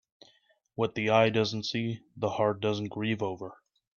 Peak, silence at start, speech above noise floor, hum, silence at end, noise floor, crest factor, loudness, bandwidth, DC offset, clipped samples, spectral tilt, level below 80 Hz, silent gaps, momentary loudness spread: -8 dBFS; 0.8 s; 38 dB; none; 0.45 s; -67 dBFS; 22 dB; -29 LUFS; 7.2 kHz; under 0.1%; under 0.1%; -6 dB/octave; -68 dBFS; none; 12 LU